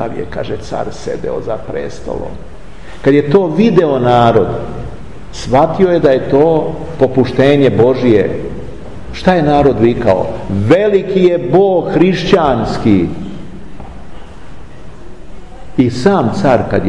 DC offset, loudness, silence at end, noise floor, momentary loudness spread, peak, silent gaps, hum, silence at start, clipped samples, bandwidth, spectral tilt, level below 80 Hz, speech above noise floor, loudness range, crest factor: 5%; -12 LUFS; 0 s; -32 dBFS; 18 LU; 0 dBFS; none; none; 0 s; under 0.1%; 10.5 kHz; -7.5 dB/octave; -34 dBFS; 21 dB; 7 LU; 12 dB